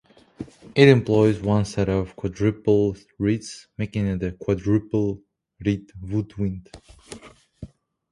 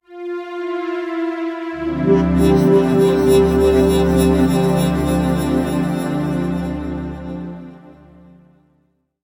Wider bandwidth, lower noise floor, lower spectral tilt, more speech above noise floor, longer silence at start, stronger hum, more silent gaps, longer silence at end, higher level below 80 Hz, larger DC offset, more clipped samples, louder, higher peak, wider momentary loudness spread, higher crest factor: second, 11.5 kHz vs 17 kHz; second, -45 dBFS vs -63 dBFS; about the same, -7 dB/octave vs -7 dB/octave; second, 24 dB vs 50 dB; first, 0.4 s vs 0.1 s; neither; neither; second, 0.45 s vs 1.35 s; second, -44 dBFS vs -32 dBFS; neither; neither; second, -23 LUFS vs -17 LUFS; about the same, 0 dBFS vs -2 dBFS; first, 23 LU vs 14 LU; first, 22 dB vs 16 dB